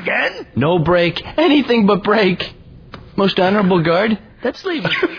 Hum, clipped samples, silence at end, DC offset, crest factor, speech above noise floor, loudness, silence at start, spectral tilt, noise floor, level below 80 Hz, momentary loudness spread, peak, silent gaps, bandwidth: none; under 0.1%; 0 s; under 0.1%; 14 dB; 22 dB; -16 LUFS; 0 s; -7.5 dB/octave; -37 dBFS; -44 dBFS; 9 LU; -2 dBFS; none; 5.4 kHz